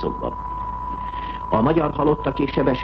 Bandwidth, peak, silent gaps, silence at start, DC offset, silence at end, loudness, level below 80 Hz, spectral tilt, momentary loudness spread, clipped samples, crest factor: 6.2 kHz; -6 dBFS; none; 0 s; under 0.1%; 0 s; -23 LUFS; -36 dBFS; -9.5 dB/octave; 10 LU; under 0.1%; 16 dB